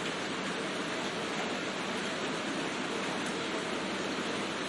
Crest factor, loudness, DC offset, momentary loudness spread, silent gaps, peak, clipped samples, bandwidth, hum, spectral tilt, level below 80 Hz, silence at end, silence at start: 12 dB; -34 LUFS; under 0.1%; 1 LU; none; -22 dBFS; under 0.1%; 11.5 kHz; none; -3.5 dB/octave; -70 dBFS; 0 s; 0 s